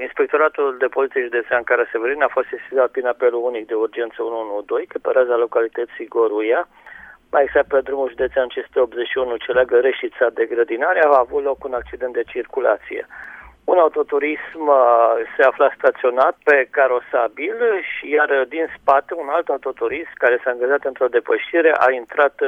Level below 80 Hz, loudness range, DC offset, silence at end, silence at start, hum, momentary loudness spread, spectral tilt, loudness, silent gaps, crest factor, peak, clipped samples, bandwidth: -56 dBFS; 5 LU; under 0.1%; 0 s; 0 s; none; 9 LU; -5.5 dB/octave; -18 LUFS; none; 18 dB; 0 dBFS; under 0.1%; 4 kHz